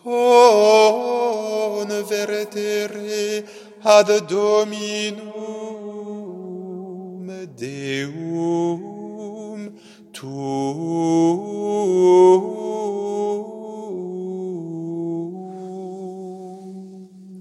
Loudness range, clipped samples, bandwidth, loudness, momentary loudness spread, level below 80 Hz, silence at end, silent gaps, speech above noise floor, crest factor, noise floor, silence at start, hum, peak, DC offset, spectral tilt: 11 LU; under 0.1%; 14.5 kHz; -19 LUFS; 20 LU; -76 dBFS; 0 s; none; 23 dB; 20 dB; -42 dBFS; 0.05 s; none; 0 dBFS; under 0.1%; -5 dB/octave